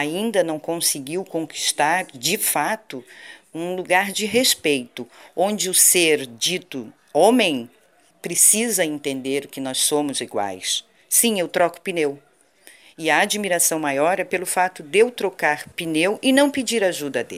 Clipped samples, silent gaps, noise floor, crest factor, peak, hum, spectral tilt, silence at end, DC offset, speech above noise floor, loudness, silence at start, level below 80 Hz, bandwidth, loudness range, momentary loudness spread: under 0.1%; none; -51 dBFS; 20 dB; 0 dBFS; none; -2 dB/octave; 0 s; under 0.1%; 30 dB; -20 LUFS; 0 s; -70 dBFS; 16 kHz; 4 LU; 12 LU